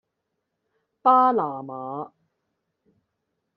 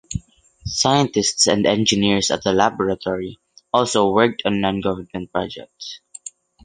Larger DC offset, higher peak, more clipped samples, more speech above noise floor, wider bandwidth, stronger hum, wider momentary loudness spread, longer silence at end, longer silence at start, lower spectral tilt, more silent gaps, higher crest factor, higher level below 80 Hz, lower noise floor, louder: neither; second, -6 dBFS vs 0 dBFS; neither; first, 58 dB vs 21 dB; second, 5.2 kHz vs 10 kHz; neither; about the same, 17 LU vs 18 LU; first, 1.5 s vs 0.35 s; first, 1.05 s vs 0.1 s; first, -5.5 dB/octave vs -3.5 dB/octave; neither; about the same, 20 dB vs 20 dB; second, -80 dBFS vs -46 dBFS; first, -80 dBFS vs -40 dBFS; about the same, -21 LUFS vs -19 LUFS